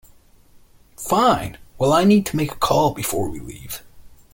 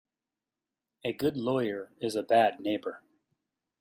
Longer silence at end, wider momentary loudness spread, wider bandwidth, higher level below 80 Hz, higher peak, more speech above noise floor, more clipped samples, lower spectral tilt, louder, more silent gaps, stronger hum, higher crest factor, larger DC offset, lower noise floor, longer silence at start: second, 0.2 s vs 0.85 s; first, 18 LU vs 12 LU; about the same, 17 kHz vs 15.5 kHz; first, -46 dBFS vs -72 dBFS; first, -2 dBFS vs -12 dBFS; second, 32 dB vs over 61 dB; neither; about the same, -5 dB/octave vs -5.5 dB/octave; first, -19 LUFS vs -30 LUFS; neither; neither; about the same, 18 dB vs 20 dB; neither; second, -50 dBFS vs under -90 dBFS; about the same, 1 s vs 1.05 s